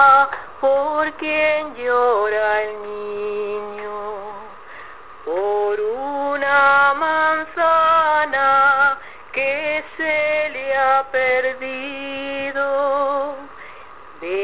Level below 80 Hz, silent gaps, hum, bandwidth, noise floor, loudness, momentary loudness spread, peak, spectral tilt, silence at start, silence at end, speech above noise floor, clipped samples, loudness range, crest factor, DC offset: -56 dBFS; none; none; 4 kHz; -41 dBFS; -19 LUFS; 16 LU; -2 dBFS; -6.5 dB/octave; 0 s; 0 s; 20 dB; under 0.1%; 9 LU; 18 dB; 0.7%